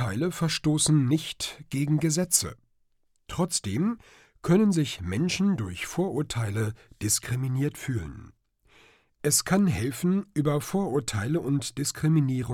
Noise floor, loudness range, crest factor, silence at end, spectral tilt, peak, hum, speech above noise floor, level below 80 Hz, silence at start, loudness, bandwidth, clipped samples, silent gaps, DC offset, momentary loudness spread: -68 dBFS; 3 LU; 20 dB; 0 s; -5 dB/octave; -8 dBFS; none; 42 dB; -54 dBFS; 0 s; -26 LUFS; 17 kHz; under 0.1%; none; under 0.1%; 10 LU